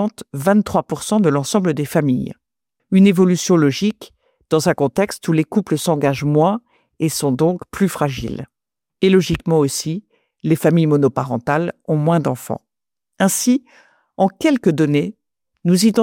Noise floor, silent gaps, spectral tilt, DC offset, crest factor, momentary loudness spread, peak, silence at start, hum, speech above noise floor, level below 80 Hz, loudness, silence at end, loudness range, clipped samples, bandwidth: -83 dBFS; none; -6 dB/octave; under 0.1%; 14 dB; 9 LU; -4 dBFS; 0 s; none; 66 dB; -48 dBFS; -17 LUFS; 0 s; 3 LU; under 0.1%; 17 kHz